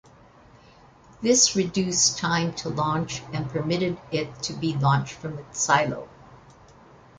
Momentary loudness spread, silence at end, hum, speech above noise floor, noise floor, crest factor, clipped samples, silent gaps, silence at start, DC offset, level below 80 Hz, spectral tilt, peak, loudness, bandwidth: 12 LU; 0.8 s; none; 28 dB; -52 dBFS; 22 dB; under 0.1%; none; 1.2 s; under 0.1%; -56 dBFS; -3.5 dB/octave; -4 dBFS; -24 LUFS; 10.5 kHz